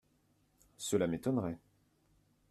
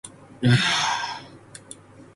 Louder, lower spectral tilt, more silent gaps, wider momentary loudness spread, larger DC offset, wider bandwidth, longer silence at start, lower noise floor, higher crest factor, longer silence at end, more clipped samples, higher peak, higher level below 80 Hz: second, -36 LUFS vs -22 LUFS; first, -5.5 dB/octave vs -4 dB/octave; neither; second, 10 LU vs 24 LU; neither; first, 14.5 kHz vs 11.5 kHz; first, 0.8 s vs 0.05 s; first, -73 dBFS vs -46 dBFS; about the same, 20 dB vs 18 dB; first, 0.95 s vs 0.1 s; neither; second, -18 dBFS vs -6 dBFS; second, -70 dBFS vs -56 dBFS